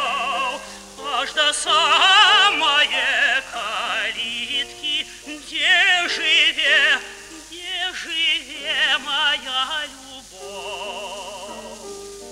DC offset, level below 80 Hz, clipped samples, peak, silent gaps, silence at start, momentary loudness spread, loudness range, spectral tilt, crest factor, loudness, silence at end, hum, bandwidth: under 0.1%; -56 dBFS; under 0.1%; -2 dBFS; none; 0 s; 21 LU; 7 LU; 1 dB/octave; 20 dB; -17 LUFS; 0 s; 50 Hz at -55 dBFS; 16 kHz